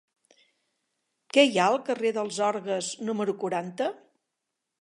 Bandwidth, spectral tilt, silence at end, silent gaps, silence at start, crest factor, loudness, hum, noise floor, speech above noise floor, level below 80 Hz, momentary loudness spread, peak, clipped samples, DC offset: 11.5 kHz; -3.5 dB/octave; 0.85 s; none; 1.35 s; 22 dB; -26 LUFS; none; -84 dBFS; 58 dB; -84 dBFS; 10 LU; -6 dBFS; under 0.1%; under 0.1%